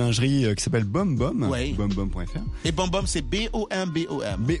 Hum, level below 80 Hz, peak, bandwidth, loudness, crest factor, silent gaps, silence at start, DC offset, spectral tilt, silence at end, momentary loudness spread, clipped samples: none; -34 dBFS; -10 dBFS; 11.5 kHz; -25 LUFS; 14 dB; none; 0 s; under 0.1%; -5.5 dB/octave; 0 s; 6 LU; under 0.1%